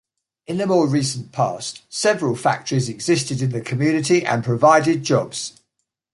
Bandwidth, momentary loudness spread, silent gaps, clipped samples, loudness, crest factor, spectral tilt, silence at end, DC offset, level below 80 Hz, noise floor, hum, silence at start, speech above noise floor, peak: 11.5 kHz; 11 LU; none; under 0.1%; -20 LUFS; 18 dB; -5 dB/octave; 0.65 s; under 0.1%; -60 dBFS; -76 dBFS; none; 0.5 s; 57 dB; -2 dBFS